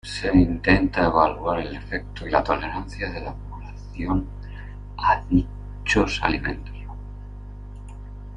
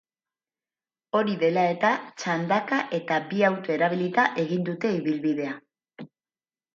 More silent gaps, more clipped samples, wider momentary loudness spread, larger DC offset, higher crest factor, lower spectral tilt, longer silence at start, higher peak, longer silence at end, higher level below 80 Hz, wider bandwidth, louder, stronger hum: neither; neither; first, 21 LU vs 7 LU; neither; about the same, 22 dB vs 20 dB; about the same, -6 dB/octave vs -6 dB/octave; second, 0.05 s vs 1.15 s; first, -2 dBFS vs -8 dBFS; second, 0 s vs 0.7 s; first, -34 dBFS vs -76 dBFS; first, 10 kHz vs 7.4 kHz; about the same, -23 LUFS vs -25 LUFS; first, 50 Hz at -35 dBFS vs none